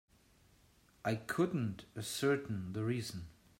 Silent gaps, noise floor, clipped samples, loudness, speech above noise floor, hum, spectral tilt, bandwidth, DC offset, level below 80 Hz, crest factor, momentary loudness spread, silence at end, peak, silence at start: none; -68 dBFS; under 0.1%; -38 LUFS; 31 dB; none; -5.5 dB/octave; 16 kHz; under 0.1%; -68 dBFS; 18 dB; 9 LU; 0.3 s; -20 dBFS; 1.05 s